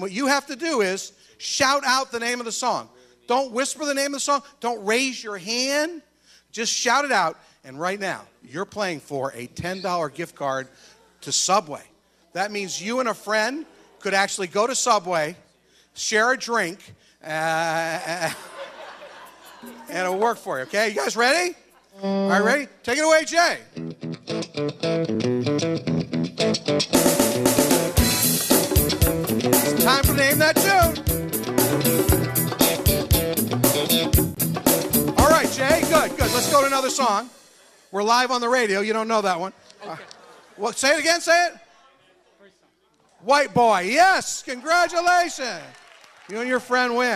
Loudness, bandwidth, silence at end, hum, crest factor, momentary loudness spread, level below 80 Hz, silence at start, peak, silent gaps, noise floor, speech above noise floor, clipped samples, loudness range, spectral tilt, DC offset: -21 LUFS; 15 kHz; 0 s; none; 18 dB; 14 LU; -40 dBFS; 0 s; -4 dBFS; none; -62 dBFS; 40 dB; under 0.1%; 7 LU; -3.5 dB/octave; under 0.1%